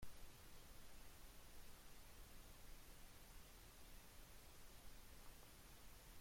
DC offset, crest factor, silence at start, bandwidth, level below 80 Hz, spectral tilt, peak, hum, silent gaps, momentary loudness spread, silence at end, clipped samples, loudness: under 0.1%; 16 dB; 0 s; 16.5 kHz; -64 dBFS; -3 dB/octave; -42 dBFS; none; none; 0 LU; 0 s; under 0.1%; -64 LUFS